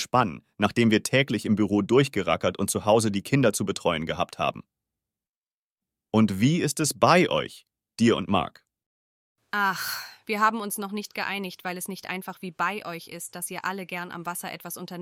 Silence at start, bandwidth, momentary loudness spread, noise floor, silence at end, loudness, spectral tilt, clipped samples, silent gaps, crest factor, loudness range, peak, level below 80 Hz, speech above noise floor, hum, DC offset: 0 s; 17 kHz; 13 LU; under -90 dBFS; 0 s; -25 LUFS; -4.5 dB/octave; under 0.1%; 5.29-5.75 s, 8.86-9.35 s; 22 dB; 8 LU; -4 dBFS; -62 dBFS; over 65 dB; none; under 0.1%